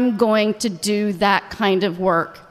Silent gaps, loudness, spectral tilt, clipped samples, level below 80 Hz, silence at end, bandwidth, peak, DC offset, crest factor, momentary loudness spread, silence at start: none; -19 LUFS; -4.5 dB/octave; under 0.1%; -54 dBFS; 0.1 s; 14.5 kHz; -2 dBFS; under 0.1%; 16 dB; 4 LU; 0 s